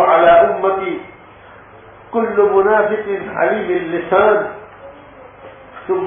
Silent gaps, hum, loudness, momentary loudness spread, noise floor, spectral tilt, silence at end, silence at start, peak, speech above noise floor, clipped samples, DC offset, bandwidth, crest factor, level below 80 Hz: none; none; -15 LUFS; 17 LU; -40 dBFS; -9.5 dB/octave; 0 s; 0 s; -2 dBFS; 26 dB; under 0.1%; under 0.1%; 3.7 kHz; 14 dB; -52 dBFS